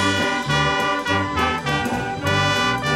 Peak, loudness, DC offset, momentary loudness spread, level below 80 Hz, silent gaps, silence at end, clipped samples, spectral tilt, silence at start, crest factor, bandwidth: -6 dBFS; -20 LUFS; under 0.1%; 4 LU; -42 dBFS; none; 0 s; under 0.1%; -4 dB/octave; 0 s; 16 dB; 16 kHz